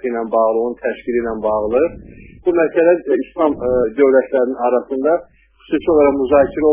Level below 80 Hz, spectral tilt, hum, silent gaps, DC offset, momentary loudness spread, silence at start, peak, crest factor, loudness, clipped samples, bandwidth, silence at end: -44 dBFS; -10.5 dB/octave; none; none; under 0.1%; 7 LU; 0.05 s; 0 dBFS; 16 dB; -16 LUFS; under 0.1%; 3.6 kHz; 0 s